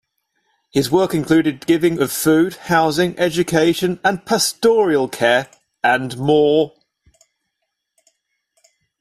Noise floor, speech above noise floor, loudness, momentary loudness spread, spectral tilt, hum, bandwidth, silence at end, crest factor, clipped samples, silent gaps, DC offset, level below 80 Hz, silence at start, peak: -76 dBFS; 59 dB; -17 LUFS; 4 LU; -4.5 dB/octave; none; 15 kHz; 2.35 s; 16 dB; under 0.1%; none; under 0.1%; -52 dBFS; 0.75 s; -2 dBFS